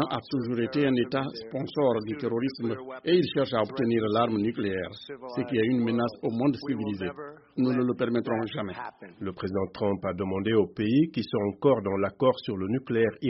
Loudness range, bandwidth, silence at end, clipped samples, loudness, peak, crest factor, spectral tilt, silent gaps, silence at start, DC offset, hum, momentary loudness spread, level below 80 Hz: 3 LU; 5.8 kHz; 0 s; under 0.1%; -28 LUFS; -10 dBFS; 18 dB; -5.5 dB/octave; none; 0 s; under 0.1%; none; 10 LU; -64 dBFS